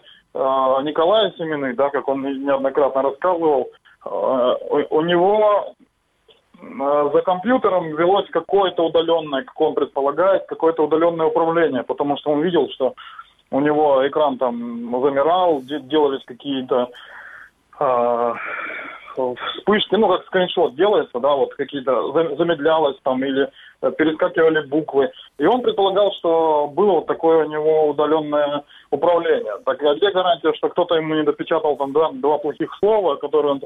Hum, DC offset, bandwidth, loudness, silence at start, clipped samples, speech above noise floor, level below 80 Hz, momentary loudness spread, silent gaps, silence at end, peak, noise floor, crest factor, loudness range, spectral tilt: none; under 0.1%; 4 kHz; -19 LUFS; 0.35 s; under 0.1%; 40 dB; -62 dBFS; 8 LU; none; 0 s; -4 dBFS; -58 dBFS; 14 dB; 3 LU; -7.5 dB/octave